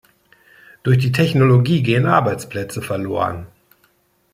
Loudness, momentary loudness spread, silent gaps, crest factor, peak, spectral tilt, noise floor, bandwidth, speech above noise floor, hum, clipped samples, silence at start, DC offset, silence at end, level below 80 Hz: -17 LUFS; 12 LU; none; 16 dB; -2 dBFS; -7 dB/octave; -60 dBFS; 15 kHz; 44 dB; none; under 0.1%; 0.85 s; under 0.1%; 0.85 s; -52 dBFS